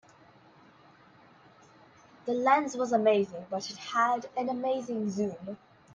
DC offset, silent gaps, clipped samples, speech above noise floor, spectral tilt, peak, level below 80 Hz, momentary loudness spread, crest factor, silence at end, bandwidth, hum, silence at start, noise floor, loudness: under 0.1%; none; under 0.1%; 29 dB; -5 dB/octave; -12 dBFS; -76 dBFS; 13 LU; 20 dB; 0.4 s; 9.6 kHz; none; 2.25 s; -58 dBFS; -29 LUFS